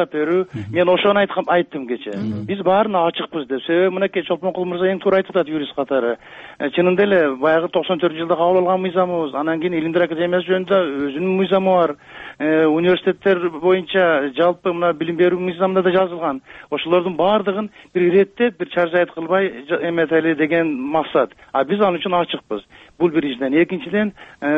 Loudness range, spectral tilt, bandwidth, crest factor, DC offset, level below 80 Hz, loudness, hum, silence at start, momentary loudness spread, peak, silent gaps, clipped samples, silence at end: 2 LU; -8 dB/octave; 4.8 kHz; 14 dB; under 0.1%; -60 dBFS; -18 LUFS; none; 0 s; 9 LU; -4 dBFS; none; under 0.1%; 0 s